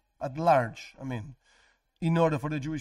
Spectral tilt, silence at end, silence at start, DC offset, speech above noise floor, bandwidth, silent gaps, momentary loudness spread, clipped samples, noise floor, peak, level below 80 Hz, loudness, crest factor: -7.5 dB/octave; 0 s; 0.2 s; under 0.1%; 38 dB; 12 kHz; none; 15 LU; under 0.1%; -66 dBFS; -12 dBFS; -58 dBFS; -28 LUFS; 18 dB